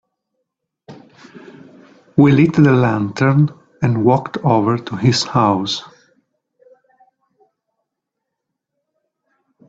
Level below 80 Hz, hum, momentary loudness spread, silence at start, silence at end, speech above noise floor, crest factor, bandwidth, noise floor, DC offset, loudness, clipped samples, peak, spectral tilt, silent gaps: -54 dBFS; none; 8 LU; 0.9 s; 3.85 s; 65 dB; 18 dB; 8 kHz; -79 dBFS; under 0.1%; -15 LUFS; under 0.1%; 0 dBFS; -6.5 dB/octave; none